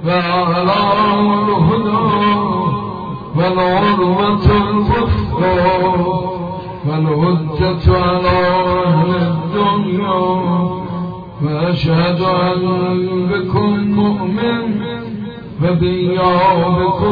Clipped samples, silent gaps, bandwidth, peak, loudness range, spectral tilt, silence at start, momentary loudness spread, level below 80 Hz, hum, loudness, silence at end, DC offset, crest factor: under 0.1%; none; 5 kHz; 0 dBFS; 2 LU; -9.5 dB/octave; 0 s; 9 LU; -32 dBFS; none; -15 LUFS; 0 s; under 0.1%; 14 dB